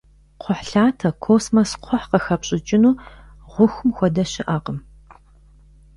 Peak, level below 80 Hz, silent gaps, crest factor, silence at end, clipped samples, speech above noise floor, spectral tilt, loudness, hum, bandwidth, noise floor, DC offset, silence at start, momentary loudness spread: -2 dBFS; -46 dBFS; none; 18 dB; 1.15 s; under 0.1%; 31 dB; -6 dB/octave; -19 LUFS; none; 11.5 kHz; -49 dBFS; under 0.1%; 0.45 s; 10 LU